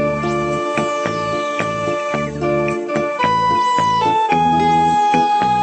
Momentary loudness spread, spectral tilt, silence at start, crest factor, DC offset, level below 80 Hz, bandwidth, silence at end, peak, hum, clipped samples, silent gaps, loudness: 6 LU; -5.5 dB/octave; 0 s; 16 dB; under 0.1%; -44 dBFS; 8.8 kHz; 0 s; 0 dBFS; none; under 0.1%; none; -17 LUFS